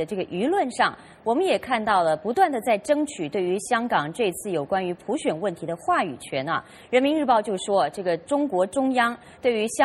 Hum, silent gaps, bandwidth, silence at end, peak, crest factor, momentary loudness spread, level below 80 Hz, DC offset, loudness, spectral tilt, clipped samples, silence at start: none; none; 14 kHz; 0 s; -6 dBFS; 18 dB; 7 LU; -64 dBFS; under 0.1%; -24 LUFS; -4.5 dB/octave; under 0.1%; 0 s